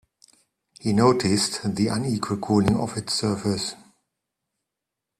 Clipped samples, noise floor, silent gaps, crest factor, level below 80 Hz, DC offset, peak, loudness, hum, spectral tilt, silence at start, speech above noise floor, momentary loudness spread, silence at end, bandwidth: under 0.1%; -85 dBFS; none; 22 dB; -54 dBFS; under 0.1%; -2 dBFS; -23 LUFS; none; -5 dB/octave; 0.8 s; 62 dB; 8 LU; 1.45 s; 13.5 kHz